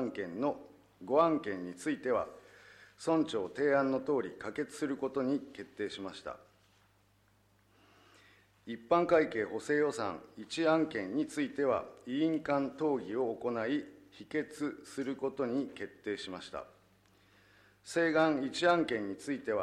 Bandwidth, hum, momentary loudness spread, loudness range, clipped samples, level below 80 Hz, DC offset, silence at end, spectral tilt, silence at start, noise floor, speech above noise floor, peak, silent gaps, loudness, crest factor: 12.5 kHz; none; 15 LU; 7 LU; under 0.1%; -72 dBFS; under 0.1%; 0 s; -5.5 dB/octave; 0 s; -69 dBFS; 36 dB; -14 dBFS; none; -34 LUFS; 20 dB